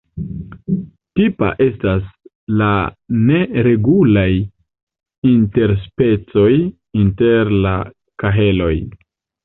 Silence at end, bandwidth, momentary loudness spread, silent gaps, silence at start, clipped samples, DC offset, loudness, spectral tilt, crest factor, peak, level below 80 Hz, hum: 0.5 s; 4.1 kHz; 13 LU; 2.35-2.47 s, 4.83-4.87 s, 5.18-5.22 s; 0.15 s; under 0.1%; under 0.1%; -16 LUFS; -12 dB/octave; 14 dB; -2 dBFS; -34 dBFS; none